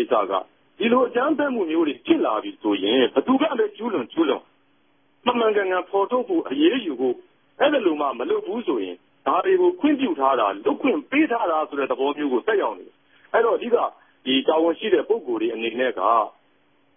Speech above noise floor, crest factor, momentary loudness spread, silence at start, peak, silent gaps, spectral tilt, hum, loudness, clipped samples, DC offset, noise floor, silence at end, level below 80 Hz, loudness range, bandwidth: 43 dB; 16 dB; 7 LU; 0 s; -6 dBFS; none; -9 dB/octave; none; -22 LUFS; under 0.1%; under 0.1%; -64 dBFS; 0.65 s; -70 dBFS; 2 LU; 3.7 kHz